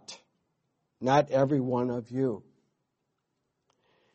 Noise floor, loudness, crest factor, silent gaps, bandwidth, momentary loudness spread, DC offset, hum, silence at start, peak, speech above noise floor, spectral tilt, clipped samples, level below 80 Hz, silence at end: -81 dBFS; -28 LUFS; 22 dB; none; 8.4 kHz; 12 LU; under 0.1%; none; 0.1 s; -10 dBFS; 54 dB; -7 dB/octave; under 0.1%; -68 dBFS; 1.75 s